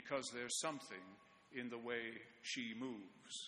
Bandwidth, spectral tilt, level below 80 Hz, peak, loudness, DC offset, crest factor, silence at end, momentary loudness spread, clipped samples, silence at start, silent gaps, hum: 10.5 kHz; -2 dB/octave; -86 dBFS; -26 dBFS; -46 LUFS; under 0.1%; 22 dB; 0 s; 13 LU; under 0.1%; 0 s; none; none